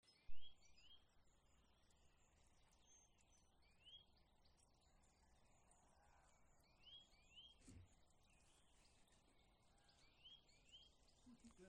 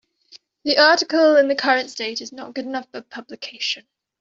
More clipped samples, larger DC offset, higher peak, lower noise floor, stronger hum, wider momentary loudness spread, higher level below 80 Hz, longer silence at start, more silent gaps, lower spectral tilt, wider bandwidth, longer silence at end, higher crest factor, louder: neither; neither; second, -36 dBFS vs -2 dBFS; first, -77 dBFS vs -51 dBFS; neither; second, 4 LU vs 19 LU; second, -76 dBFS vs -70 dBFS; second, 0.05 s vs 0.35 s; neither; first, -3 dB/octave vs -1.5 dB/octave; first, 10 kHz vs 7.6 kHz; second, 0 s vs 0.4 s; about the same, 22 dB vs 18 dB; second, -67 LUFS vs -19 LUFS